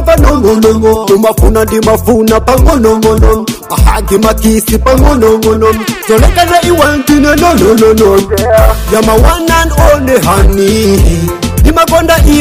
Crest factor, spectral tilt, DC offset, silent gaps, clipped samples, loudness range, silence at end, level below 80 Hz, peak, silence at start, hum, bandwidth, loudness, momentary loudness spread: 6 dB; -5.5 dB/octave; 0.2%; none; 2%; 1 LU; 0 s; -12 dBFS; 0 dBFS; 0 s; none; 16.5 kHz; -7 LUFS; 3 LU